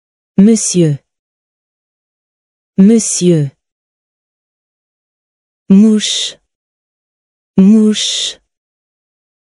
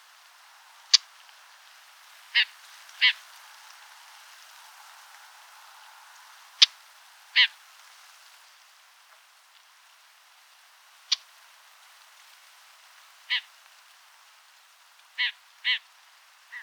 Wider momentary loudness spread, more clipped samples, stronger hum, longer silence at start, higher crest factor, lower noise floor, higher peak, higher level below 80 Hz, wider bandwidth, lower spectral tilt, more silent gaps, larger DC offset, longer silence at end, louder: second, 12 LU vs 28 LU; first, 0.1% vs under 0.1%; neither; second, 0.4 s vs 0.95 s; second, 14 dB vs 32 dB; first, under -90 dBFS vs -57 dBFS; about the same, 0 dBFS vs 0 dBFS; first, -56 dBFS vs under -90 dBFS; second, 11.5 kHz vs over 20 kHz; first, -5 dB/octave vs 10.5 dB/octave; first, 1.19-2.73 s, 3.72-5.66 s, 6.55-7.54 s vs none; neither; first, 1.2 s vs 0 s; first, -11 LUFS vs -24 LUFS